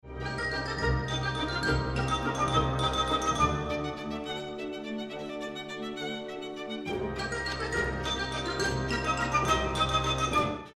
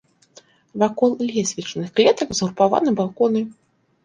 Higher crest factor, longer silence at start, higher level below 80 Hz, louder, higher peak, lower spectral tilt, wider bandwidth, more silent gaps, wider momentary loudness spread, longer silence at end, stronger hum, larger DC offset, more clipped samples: about the same, 18 dB vs 18 dB; second, 0.05 s vs 0.75 s; first, -42 dBFS vs -60 dBFS; second, -30 LUFS vs -20 LUFS; second, -12 dBFS vs -2 dBFS; about the same, -4.5 dB/octave vs -4.5 dB/octave; first, 13.5 kHz vs 10 kHz; neither; about the same, 10 LU vs 8 LU; second, 0.05 s vs 0.55 s; neither; neither; neither